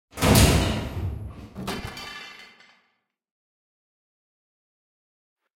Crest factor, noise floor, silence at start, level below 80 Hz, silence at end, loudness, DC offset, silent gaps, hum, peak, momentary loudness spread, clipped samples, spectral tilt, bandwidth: 24 dB; -73 dBFS; 0.15 s; -36 dBFS; 3.15 s; -22 LUFS; under 0.1%; none; none; -4 dBFS; 21 LU; under 0.1%; -4.5 dB/octave; 16.5 kHz